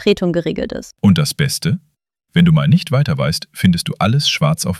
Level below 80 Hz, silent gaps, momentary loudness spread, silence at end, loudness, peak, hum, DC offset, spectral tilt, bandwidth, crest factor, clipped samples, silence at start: -44 dBFS; none; 8 LU; 0 s; -16 LUFS; -2 dBFS; none; under 0.1%; -5.5 dB/octave; 15 kHz; 14 dB; under 0.1%; 0 s